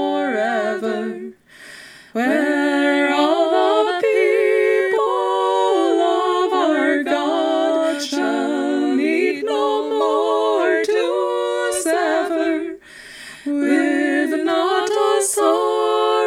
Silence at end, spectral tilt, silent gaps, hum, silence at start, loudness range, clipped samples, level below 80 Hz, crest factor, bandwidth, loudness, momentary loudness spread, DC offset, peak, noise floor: 0 s; -2.5 dB/octave; none; none; 0 s; 3 LU; under 0.1%; -66 dBFS; 14 dB; 15 kHz; -18 LUFS; 8 LU; under 0.1%; -4 dBFS; -41 dBFS